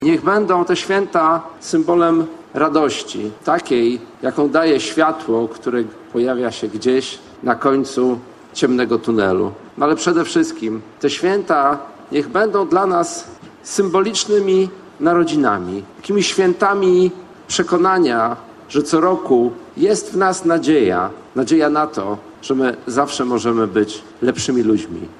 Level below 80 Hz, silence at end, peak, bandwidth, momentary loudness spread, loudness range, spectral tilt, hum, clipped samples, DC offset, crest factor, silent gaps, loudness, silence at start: -56 dBFS; 0.05 s; 0 dBFS; 11.5 kHz; 9 LU; 2 LU; -4.5 dB/octave; none; under 0.1%; under 0.1%; 16 dB; none; -17 LUFS; 0 s